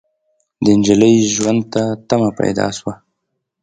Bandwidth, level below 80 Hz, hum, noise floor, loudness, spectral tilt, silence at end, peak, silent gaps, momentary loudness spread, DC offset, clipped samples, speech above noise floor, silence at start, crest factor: 9.4 kHz; -50 dBFS; none; -74 dBFS; -15 LUFS; -5 dB/octave; 0.7 s; 0 dBFS; none; 10 LU; under 0.1%; under 0.1%; 60 dB; 0.6 s; 16 dB